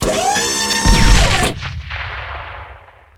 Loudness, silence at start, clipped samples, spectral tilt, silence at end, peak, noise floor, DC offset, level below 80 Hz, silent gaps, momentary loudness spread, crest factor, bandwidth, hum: -15 LUFS; 0 s; under 0.1%; -3 dB/octave; 0.4 s; 0 dBFS; -40 dBFS; under 0.1%; -20 dBFS; none; 17 LU; 16 dB; 17 kHz; none